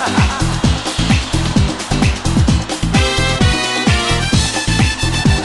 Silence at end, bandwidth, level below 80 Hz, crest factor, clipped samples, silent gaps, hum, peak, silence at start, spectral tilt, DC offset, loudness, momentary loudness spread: 0 s; 12.5 kHz; -22 dBFS; 12 dB; under 0.1%; none; none; -2 dBFS; 0 s; -4.5 dB/octave; under 0.1%; -15 LUFS; 3 LU